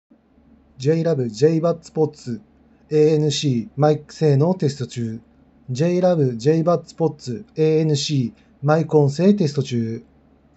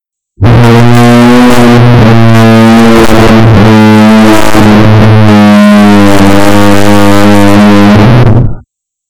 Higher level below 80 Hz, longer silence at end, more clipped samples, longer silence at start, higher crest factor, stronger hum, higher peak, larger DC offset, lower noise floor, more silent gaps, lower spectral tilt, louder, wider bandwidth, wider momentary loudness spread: second, -60 dBFS vs -20 dBFS; first, 0.55 s vs 0 s; second, under 0.1% vs 2%; first, 0.8 s vs 0 s; first, 18 dB vs 2 dB; neither; about the same, -2 dBFS vs 0 dBFS; neither; first, -54 dBFS vs -40 dBFS; neither; about the same, -7 dB/octave vs -6.5 dB/octave; second, -20 LUFS vs -2 LUFS; second, 8.2 kHz vs 19 kHz; first, 12 LU vs 2 LU